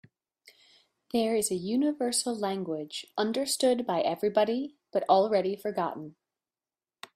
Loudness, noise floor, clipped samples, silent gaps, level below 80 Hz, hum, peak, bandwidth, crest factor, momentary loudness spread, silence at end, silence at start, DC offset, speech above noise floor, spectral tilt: -29 LUFS; under -90 dBFS; under 0.1%; none; -74 dBFS; none; -10 dBFS; 15.5 kHz; 20 dB; 10 LU; 1.05 s; 1.15 s; under 0.1%; over 62 dB; -3.5 dB/octave